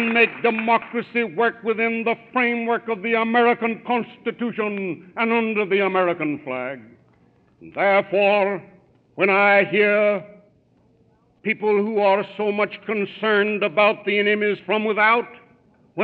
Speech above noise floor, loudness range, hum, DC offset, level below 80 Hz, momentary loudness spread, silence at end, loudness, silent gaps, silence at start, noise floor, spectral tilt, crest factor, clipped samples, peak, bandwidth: 39 dB; 4 LU; none; under 0.1%; -72 dBFS; 10 LU; 0 s; -20 LUFS; none; 0 s; -59 dBFS; -8 dB/octave; 20 dB; under 0.1%; -2 dBFS; 4.7 kHz